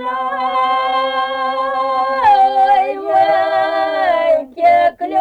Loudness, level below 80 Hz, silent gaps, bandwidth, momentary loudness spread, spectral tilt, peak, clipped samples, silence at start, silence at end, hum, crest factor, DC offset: -14 LUFS; -54 dBFS; none; 9 kHz; 7 LU; -4 dB/octave; -4 dBFS; under 0.1%; 0 s; 0 s; none; 12 dB; under 0.1%